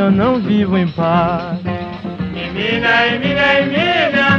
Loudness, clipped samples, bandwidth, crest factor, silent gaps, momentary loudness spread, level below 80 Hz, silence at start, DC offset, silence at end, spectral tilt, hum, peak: -15 LUFS; under 0.1%; 7 kHz; 14 dB; none; 11 LU; -42 dBFS; 0 s; under 0.1%; 0 s; -7 dB/octave; none; -2 dBFS